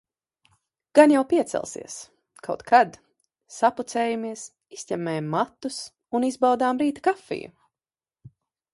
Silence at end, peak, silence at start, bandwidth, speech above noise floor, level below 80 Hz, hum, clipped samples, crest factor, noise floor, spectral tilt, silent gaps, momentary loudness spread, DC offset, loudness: 0.45 s; -2 dBFS; 0.95 s; 11.5 kHz; over 67 dB; -68 dBFS; none; under 0.1%; 24 dB; under -90 dBFS; -5 dB/octave; none; 21 LU; under 0.1%; -23 LUFS